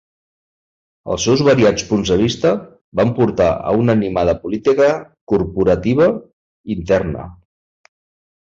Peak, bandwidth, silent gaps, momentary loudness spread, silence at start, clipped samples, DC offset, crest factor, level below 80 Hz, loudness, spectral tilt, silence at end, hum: 0 dBFS; 7.8 kHz; 2.81-2.92 s, 5.21-5.27 s, 6.33-6.64 s; 12 LU; 1.05 s; under 0.1%; under 0.1%; 16 dB; -40 dBFS; -16 LUFS; -6 dB/octave; 1.1 s; none